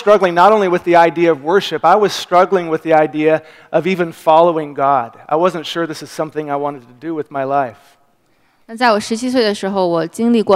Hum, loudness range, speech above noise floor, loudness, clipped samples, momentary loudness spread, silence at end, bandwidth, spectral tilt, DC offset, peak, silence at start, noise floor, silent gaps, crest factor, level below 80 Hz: none; 8 LU; 42 dB; -15 LUFS; under 0.1%; 12 LU; 0 s; 15.5 kHz; -5.5 dB/octave; under 0.1%; 0 dBFS; 0 s; -57 dBFS; none; 14 dB; -62 dBFS